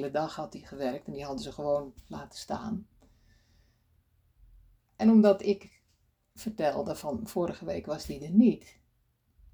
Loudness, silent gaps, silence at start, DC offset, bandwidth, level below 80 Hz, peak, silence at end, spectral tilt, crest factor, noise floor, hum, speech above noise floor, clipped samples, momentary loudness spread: -29 LUFS; none; 0 s; under 0.1%; over 20 kHz; -60 dBFS; -10 dBFS; 0.95 s; -7 dB/octave; 22 dB; -72 dBFS; none; 43 dB; under 0.1%; 17 LU